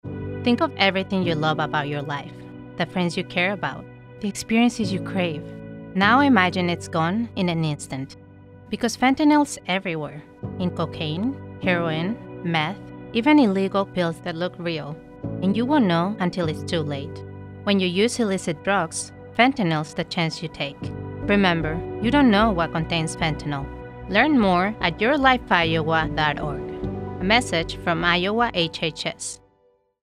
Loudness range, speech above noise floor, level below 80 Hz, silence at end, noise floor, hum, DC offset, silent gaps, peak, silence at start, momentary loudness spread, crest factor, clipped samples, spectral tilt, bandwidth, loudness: 4 LU; 41 dB; -46 dBFS; 0.65 s; -63 dBFS; none; under 0.1%; none; -2 dBFS; 0.05 s; 14 LU; 20 dB; under 0.1%; -5 dB/octave; 13.5 kHz; -22 LUFS